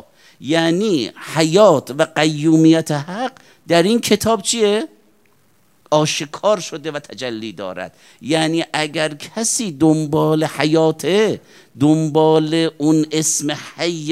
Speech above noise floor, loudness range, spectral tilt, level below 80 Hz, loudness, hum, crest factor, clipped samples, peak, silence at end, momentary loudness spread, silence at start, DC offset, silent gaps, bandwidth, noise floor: 41 dB; 6 LU; -4.5 dB/octave; -60 dBFS; -17 LUFS; none; 18 dB; under 0.1%; 0 dBFS; 0 s; 14 LU; 0.4 s; 0.1%; none; 15 kHz; -58 dBFS